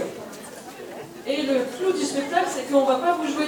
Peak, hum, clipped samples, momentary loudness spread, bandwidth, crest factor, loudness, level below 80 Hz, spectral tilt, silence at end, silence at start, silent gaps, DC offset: -8 dBFS; none; under 0.1%; 17 LU; 19.5 kHz; 16 dB; -23 LUFS; -68 dBFS; -3.5 dB/octave; 0 s; 0 s; none; under 0.1%